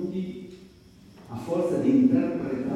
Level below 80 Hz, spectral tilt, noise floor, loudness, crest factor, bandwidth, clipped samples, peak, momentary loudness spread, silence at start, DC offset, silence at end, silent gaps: -60 dBFS; -8.5 dB/octave; -51 dBFS; -25 LUFS; 16 dB; 11 kHz; under 0.1%; -10 dBFS; 20 LU; 0 s; under 0.1%; 0 s; none